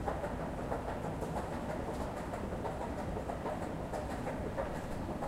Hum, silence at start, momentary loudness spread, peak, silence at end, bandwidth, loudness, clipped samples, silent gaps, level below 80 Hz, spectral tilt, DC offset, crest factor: none; 0 s; 1 LU; -22 dBFS; 0 s; 16 kHz; -39 LUFS; under 0.1%; none; -48 dBFS; -6.5 dB/octave; under 0.1%; 16 dB